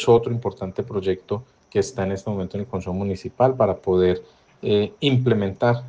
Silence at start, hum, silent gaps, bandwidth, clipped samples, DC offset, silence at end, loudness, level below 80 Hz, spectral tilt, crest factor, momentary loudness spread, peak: 0 s; none; none; 9.2 kHz; under 0.1%; under 0.1%; 0 s; -23 LUFS; -54 dBFS; -7 dB/octave; 18 dB; 10 LU; -4 dBFS